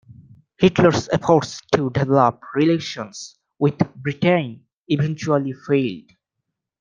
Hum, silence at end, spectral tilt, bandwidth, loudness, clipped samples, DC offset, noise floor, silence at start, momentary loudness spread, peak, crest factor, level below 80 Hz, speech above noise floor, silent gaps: none; 0.8 s; -6.5 dB/octave; 9.4 kHz; -20 LUFS; under 0.1%; under 0.1%; -80 dBFS; 0.6 s; 13 LU; -2 dBFS; 18 dB; -54 dBFS; 61 dB; 4.77-4.84 s